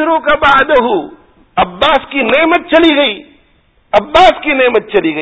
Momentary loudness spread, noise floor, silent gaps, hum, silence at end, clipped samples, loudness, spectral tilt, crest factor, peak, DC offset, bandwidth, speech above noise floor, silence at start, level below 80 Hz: 8 LU; -51 dBFS; none; none; 0 s; 0.7%; -10 LUFS; -5 dB/octave; 10 dB; 0 dBFS; under 0.1%; 8 kHz; 41 dB; 0 s; -38 dBFS